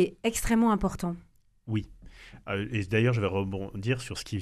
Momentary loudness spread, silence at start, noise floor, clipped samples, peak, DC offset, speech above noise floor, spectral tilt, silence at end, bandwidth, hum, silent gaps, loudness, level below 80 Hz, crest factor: 18 LU; 0 s; -49 dBFS; under 0.1%; -12 dBFS; under 0.1%; 21 dB; -6 dB/octave; 0 s; 13.5 kHz; none; none; -29 LUFS; -44 dBFS; 16 dB